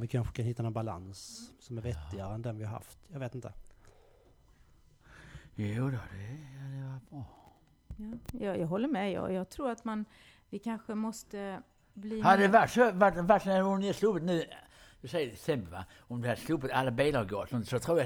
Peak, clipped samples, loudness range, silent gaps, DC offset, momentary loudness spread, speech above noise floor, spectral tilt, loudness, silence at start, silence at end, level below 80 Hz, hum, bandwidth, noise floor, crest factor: -10 dBFS; under 0.1%; 15 LU; none; under 0.1%; 21 LU; 30 dB; -6.5 dB/octave; -32 LUFS; 0 s; 0 s; -56 dBFS; none; 20 kHz; -62 dBFS; 22 dB